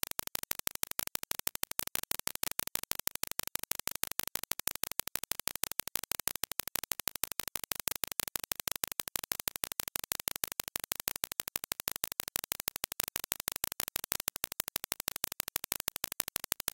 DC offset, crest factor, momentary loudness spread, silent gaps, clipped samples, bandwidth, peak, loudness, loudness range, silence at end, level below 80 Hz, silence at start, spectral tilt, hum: under 0.1%; 36 dB; 2 LU; none; under 0.1%; 17.5 kHz; -2 dBFS; -35 LUFS; 0 LU; 0.05 s; -62 dBFS; 1 s; 0 dB/octave; 50 Hz at -65 dBFS